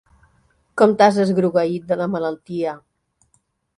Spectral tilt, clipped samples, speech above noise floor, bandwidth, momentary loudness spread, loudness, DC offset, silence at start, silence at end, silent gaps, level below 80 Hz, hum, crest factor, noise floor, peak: -6.5 dB/octave; under 0.1%; 48 dB; 11.5 kHz; 13 LU; -19 LUFS; under 0.1%; 0.75 s; 1 s; none; -62 dBFS; none; 20 dB; -65 dBFS; 0 dBFS